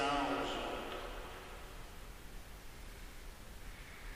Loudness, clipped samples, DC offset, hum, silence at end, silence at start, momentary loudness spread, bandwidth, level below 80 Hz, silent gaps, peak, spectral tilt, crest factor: -44 LUFS; under 0.1%; under 0.1%; none; 0 s; 0 s; 16 LU; 15.5 kHz; -52 dBFS; none; -24 dBFS; -4 dB/octave; 20 dB